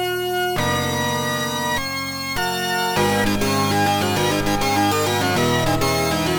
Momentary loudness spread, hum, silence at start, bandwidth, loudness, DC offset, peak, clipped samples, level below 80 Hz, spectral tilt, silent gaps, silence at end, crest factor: 4 LU; none; 0 s; over 20 kHz; -20 LUFS; under 0.1%; -6 dBFS; under 0.1%; -38 dBFS; -4 dB/octave; none; 0 s; 14 dB